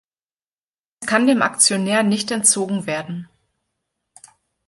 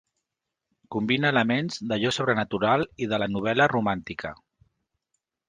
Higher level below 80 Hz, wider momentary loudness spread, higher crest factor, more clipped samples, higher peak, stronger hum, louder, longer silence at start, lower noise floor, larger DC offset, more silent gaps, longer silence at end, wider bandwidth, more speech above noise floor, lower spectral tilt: second, -66 dBFS vs -58 dBFS; first, 15 LU vs 11 LU; about the same, 22 dB vs 20 dB; neither; first, 0 dBFS vs -6 dBFS; neither; first, -17 LUFS vs -25 LUFS; about the same, 1 s vs 0.9 s; first, under -90 dBFS vs -85 dBFS; neither; neither; first, 1.45 s vs 1.15 s; first, 12 kHz vs 9.8 kHz; first, over 72 dB vs 60 dB; second, -2.5 dB/octave vs -5.5 dB/octave